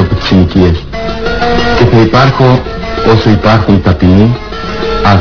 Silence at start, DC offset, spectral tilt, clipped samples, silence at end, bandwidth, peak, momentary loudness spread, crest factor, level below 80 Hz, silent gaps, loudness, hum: 0 s; under 0.1%; -7.5 dB/octave; 4%; 0 s; 5.4 kHz; 0 dBFS; 9 LU; 8 dB; -22 dBFS; none; -8 LUFS; none